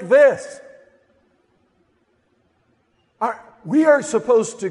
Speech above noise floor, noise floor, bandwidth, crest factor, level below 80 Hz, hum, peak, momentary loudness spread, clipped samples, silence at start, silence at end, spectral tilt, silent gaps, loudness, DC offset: 47 dB; -64 dBFS; 11.5 kHz; 16 dB; -70 dBFS; none; -4 dBFS; 20 LU; under 0.1%; 0 s; 0 s; -5 dB/octave; none; -18 LUFS; under 0.1%